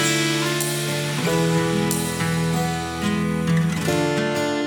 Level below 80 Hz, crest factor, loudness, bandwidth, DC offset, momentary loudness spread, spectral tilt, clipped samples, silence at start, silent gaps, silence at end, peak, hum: -48 dBFS; 16 dB; -21 LUFS; over 20 kHz; under 0.1%; 3 LU; -4.5 dB/octave; under 0.1%; 0 s; none; 0 s; -6 dBFS; none